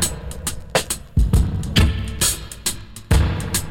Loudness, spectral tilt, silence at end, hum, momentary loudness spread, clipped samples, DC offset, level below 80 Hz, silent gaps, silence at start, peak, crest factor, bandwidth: -21 LUFS; -4 dB/octave; 0 s; none; 9 LU; under 0.1%; under 0.1%; -24 dBFS; none; 0 s; -4 dBFS; 16 dB; 17 kHz